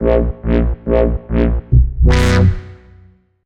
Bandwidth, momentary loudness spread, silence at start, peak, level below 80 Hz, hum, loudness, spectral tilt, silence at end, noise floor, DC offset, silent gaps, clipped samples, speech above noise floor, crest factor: 10 kHz; 5 LU; 0 s; 0 dBFS; -18 dBFS; none; -15 LUFS; -7.5 dB/octave; 0.7 s; -46 dBFS; under 0.1%; none; under 0.1%; 33 dB; 14 dB